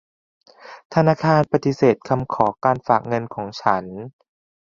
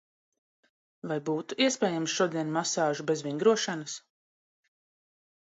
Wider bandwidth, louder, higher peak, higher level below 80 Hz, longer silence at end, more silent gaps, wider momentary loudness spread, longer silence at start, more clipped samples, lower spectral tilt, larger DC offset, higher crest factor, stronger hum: second, 7.2 kHz vs 8.2 kHz; first, -20 LUFS vs -29 LUFS; first, -2 dBFS vs -10 dBFS; first, -56 dBFS vs -82 dBFS; second, 0.7 s vs 1.45 s; first, 0.85-0.90 s vs none; about the same, 11 LU vs 11 LU; second, 0.65 s vs 1.05 s; neither; first, -7.5 dB/octave vs -3.5 dB/octave; neither; about the same, 20 dB vs 20 dB; neither